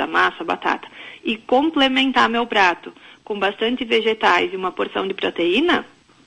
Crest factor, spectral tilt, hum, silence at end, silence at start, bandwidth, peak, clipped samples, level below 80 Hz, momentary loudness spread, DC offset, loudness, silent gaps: 16 dB; -4 dB/octave; none; 0.4 s; 0 s; 11 kHz; -4 dBFS; under 0.1%; -56 dBFS; 10 LU; under 0.1%; -19 LUFS; none